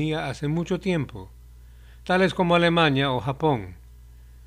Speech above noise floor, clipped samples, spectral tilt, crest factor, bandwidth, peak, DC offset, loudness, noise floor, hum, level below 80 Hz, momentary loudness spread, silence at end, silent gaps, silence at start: 23 dB; under 0.1%; -6.5 dB/octave; 20 dB; 12 kHz; -4 dBFS; under 0.1%; -23 LUFS; -46 dBFS; none; -46 dBFS; 16 LU; 0.05 s; none; 0 s